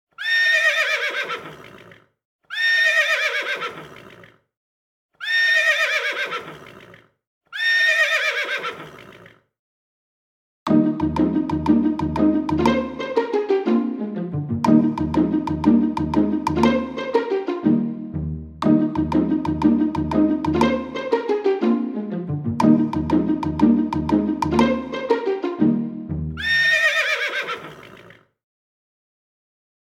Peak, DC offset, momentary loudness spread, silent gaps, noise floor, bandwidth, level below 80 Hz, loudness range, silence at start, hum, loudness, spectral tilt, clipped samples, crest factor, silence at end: -2 dBFS; under 0.1%; 12 LU; 2.25-2.39 s, 4.57-5.09 s, 7.27-7.41 s, 9.59-10.66 s; -48 dBFS; 15.5 kHz; -44 dBFS; 2 LU; 0.2 s; none; -20 LUFS; -5.5 dB/octave; under 0.1%; 18 dB; 1.9 s